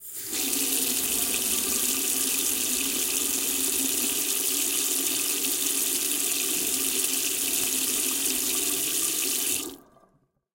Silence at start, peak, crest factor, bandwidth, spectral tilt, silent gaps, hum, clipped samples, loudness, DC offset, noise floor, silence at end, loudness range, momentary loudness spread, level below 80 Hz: 0 s; -8 dBFS; 18 dB; 17 kHz; 0.5 dB/octave; none; none; under 0.1%; -23 LUFS; under 0.1%; -66 dBFS; 0.8 s; 0 LU; 1 LU; -60 dBFS